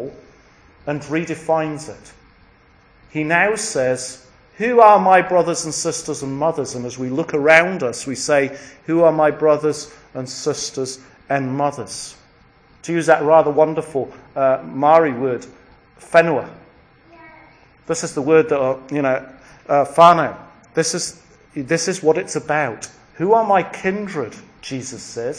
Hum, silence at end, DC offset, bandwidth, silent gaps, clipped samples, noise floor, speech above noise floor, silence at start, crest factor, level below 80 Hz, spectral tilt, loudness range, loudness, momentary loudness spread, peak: none; 0 s; under 0.1%; 10.5 kHz; none; under 0.1%; -51 dBFS; 34 dB; 0 s; 18 dB; -56 dBFS; -4.5 dB/octave; 6 LU; -18 LUFS; 17 LU; 0 dBFS